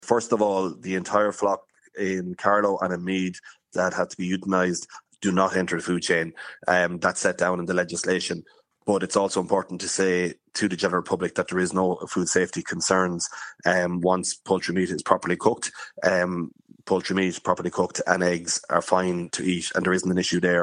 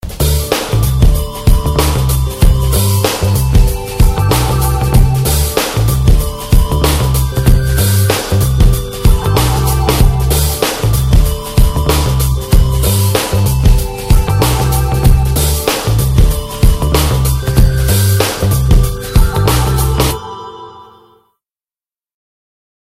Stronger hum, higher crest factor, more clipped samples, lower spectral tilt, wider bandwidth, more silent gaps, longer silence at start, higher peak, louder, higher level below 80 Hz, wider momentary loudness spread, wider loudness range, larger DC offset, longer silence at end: neither; first, 24 dB vs 10 dB; neither; about the same, -4 dB/octave vs -5 dB/octave; second, 11 kHz vs 16.5 kHz; neither; about the same, 0 s vs 0.05 s; about the same, 0 dBFS vs 0 dBFS; second, -24 LUFS vs -12 LUFS; second, -64 dBFS vs -14 dBFS; first, 7 LU vs 3 LU; about the same, 1 LU vs 1 LU; neither; second, 0 s vs 2 s